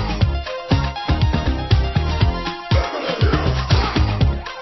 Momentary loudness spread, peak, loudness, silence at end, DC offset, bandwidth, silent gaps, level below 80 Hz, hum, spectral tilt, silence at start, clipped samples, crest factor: 4 LU; -2 dBFS; -20 LUFS; 0 s; under 0.1%; 6 kHz; none; -22 dBFS; none; -6.5 dB/octave; 0 s; under 0.1%; 16 dB